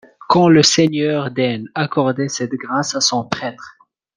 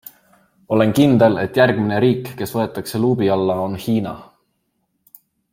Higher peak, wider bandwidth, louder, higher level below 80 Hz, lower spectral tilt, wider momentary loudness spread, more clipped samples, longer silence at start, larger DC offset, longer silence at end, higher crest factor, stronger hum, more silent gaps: about the same, 0 dBFS vs 0 dBFS; second, 10.5 kHz vs 16.5 kHz; about the same, -16 LUFS vs -17 LUFS; about the same, -58 dBFS vs -56 dBFS; second, -4 dB/octave vs -7 dB/octave; first, 12 LU vs 9 LU; neither; second, 0.3 s vs 0.7 s; neither; second, 0.45 s vs 1.3 s; about the same, 18 dB vs 18 dB; neither; neither